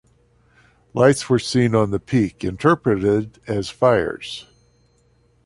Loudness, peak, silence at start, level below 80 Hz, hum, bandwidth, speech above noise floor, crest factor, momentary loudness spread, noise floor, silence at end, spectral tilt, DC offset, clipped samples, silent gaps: -19 LUFS; -2 dBFS; 0.95 s; -48 dBFS; none; 11.5 kHz; 40 dB; 20 dB; 11 LU; -59 dBFS; 1.05 s; -6 dB/octave; under 0.1%; under 0.1%; none